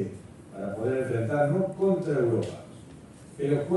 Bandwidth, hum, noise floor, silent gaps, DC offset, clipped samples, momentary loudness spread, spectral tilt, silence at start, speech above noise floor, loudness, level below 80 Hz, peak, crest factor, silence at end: 11.5 kHz; none; -47 dBFS; none; under 0.1%; under 0.1%; 21 LU; -8.5 dB/octave; 0 s; 21 dB; -28 LUFS; -60 dBFS; -12 dBFS; 16 dB; 0 s